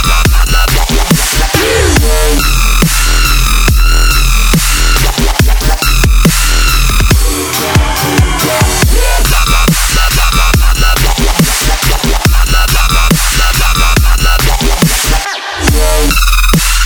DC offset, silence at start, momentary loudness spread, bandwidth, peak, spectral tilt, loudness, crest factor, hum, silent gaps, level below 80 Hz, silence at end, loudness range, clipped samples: 0.4%; 0 s; 2 LU; over 20 kHz; 0 dBFS; -3.5 dB/octave; -9 LUFS; 8 dB; none; none; -10 dBFS; 0 s; 1 LU; 0.3%